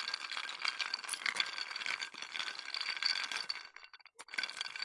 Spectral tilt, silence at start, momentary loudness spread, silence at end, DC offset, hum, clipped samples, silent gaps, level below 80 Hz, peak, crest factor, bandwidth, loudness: 2.5 dB/octave; 0 s; 9 LU; 0 s; under 0.1%; none; under 0.1%; none; under -90 dBFS; -14 dBFS; 26 dB; 11.5 kHz; -37 LUFS